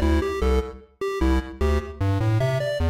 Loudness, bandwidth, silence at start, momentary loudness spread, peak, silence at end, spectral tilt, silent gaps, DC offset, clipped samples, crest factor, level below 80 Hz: -24 LUFS; 15 kHz; 0 s; 6 LU; -14 dBFS; 0 s; -7 dB/octave; none; under 0.1%; under 0.1%; 10 dB; -28 dBFS